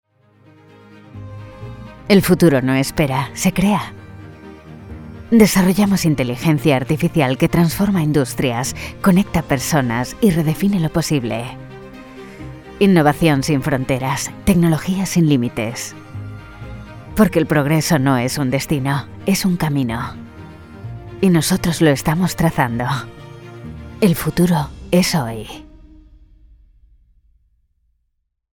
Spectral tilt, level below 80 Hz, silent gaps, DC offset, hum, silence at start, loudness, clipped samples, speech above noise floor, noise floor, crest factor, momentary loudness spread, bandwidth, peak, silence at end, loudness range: -5.5 dB/octave; -40 dBFS; none; under 0.1%; none; 1.15 s; -17 LUFS; under 0.1%; 54 dB; -70 dBFS; 18 dB; 21 LU; 19 kHz; 0 dBFS; 2.9 s; 4 LU